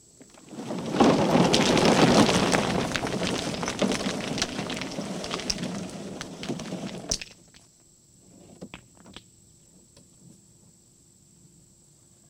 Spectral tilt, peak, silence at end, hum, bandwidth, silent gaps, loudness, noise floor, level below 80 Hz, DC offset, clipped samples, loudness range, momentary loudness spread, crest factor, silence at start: -4 dB/octave; -4 dBFS; 3.1 s; none; 17.5 kHz; none; -25 LUFS; -58 dBFS; -52 dBFS; under 0.1%; under 0.1%; 15 LU; 19 LU; 24 dB; 0.2 s